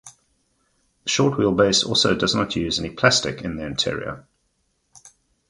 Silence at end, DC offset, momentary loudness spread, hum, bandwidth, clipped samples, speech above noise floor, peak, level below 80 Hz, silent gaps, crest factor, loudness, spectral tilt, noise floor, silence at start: 0.4 s; under 0.1%; 13 LU; none; 11.5 kHz; under 0.1%; 49 dB; -2 dBFS; -48 dBFS; none; 22 dB; -20 LUFS; -3.5 dB/octave; -70 dBFS; 0.05 s